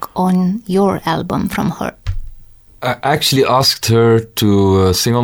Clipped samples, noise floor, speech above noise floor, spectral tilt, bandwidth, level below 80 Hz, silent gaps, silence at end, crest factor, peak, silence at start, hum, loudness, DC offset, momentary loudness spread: under 0.1%; -38 dBFS; 25 dB; -5 dB/octave; over 20 kHz; -34 dBFS; none; 0 s; 14 dB; -2 dBFS; 0 s; none; -14 LUFS; under 0.1%; 12 LU